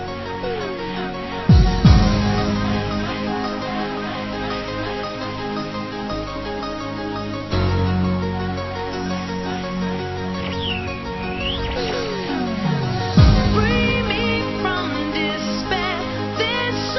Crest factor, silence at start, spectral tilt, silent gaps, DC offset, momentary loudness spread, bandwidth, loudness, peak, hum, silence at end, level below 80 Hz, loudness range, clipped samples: 20 dB; 0 s; -6.5 dB/octave; none; under 0.1%; 11 LU; 6.2 kHz; -21 LUFS; 0 dBFS; none; 0 s; -28 dBFS; 7 LU; under 0.1%